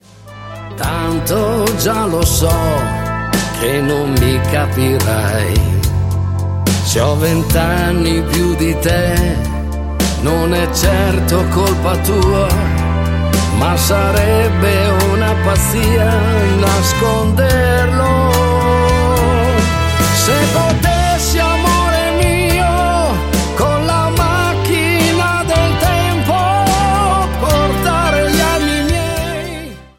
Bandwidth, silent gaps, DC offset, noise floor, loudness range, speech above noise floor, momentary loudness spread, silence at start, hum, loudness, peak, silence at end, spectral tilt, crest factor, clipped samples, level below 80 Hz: 16.5 kHz; none; under 0.1%; -33 dBFS; 2 LU; 21 dB; 5 LU; 0.2 s; none; -14 LUFS; 0 dBFS; 0.15 s; -5 dB/octave; 12 dB; under 0.1%; -22 dBFS